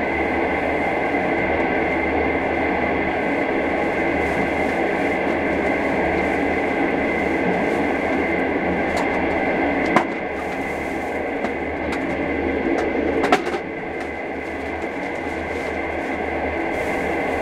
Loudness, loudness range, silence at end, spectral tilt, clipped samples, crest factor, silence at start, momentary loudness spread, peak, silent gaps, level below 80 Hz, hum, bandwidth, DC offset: -21 LUFS; 3 LU; 0 s; -6 dB/octave; under 0.1%; 22 dB; 0 s; 6 LU; 0 dBFS; none; -40 dBFS; none; 14.5 kHz; under 0.1%